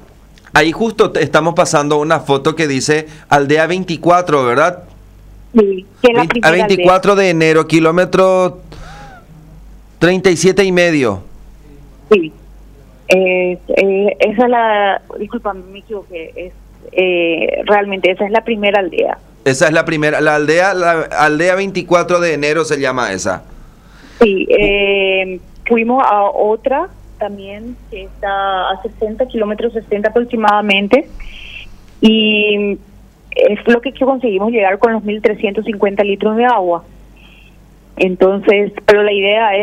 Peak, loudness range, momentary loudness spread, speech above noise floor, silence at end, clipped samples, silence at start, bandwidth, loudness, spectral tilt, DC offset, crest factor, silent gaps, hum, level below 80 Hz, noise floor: 0 dBFS; 4 LU; 13 LU; 29 dB; 0 s; under 0.1%; 0.55 s; 15 kHz; -13 LUFS; -5 dB/octave; under 0.1%; 14 dB; none; none; -40 dBFS; -42 dBFS